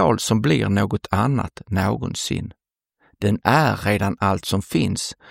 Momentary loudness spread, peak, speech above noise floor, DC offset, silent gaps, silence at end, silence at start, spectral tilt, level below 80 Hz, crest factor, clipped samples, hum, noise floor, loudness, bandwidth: 8 LU; 0 dBFS; 43 dB; under 0.1%; none; 0 s; 0 s; -5.5 dB/octave; -46 dBFS; 20 dB; under 0.1%; none; -64 dBFS; -21 LUFS; 16.5 kHz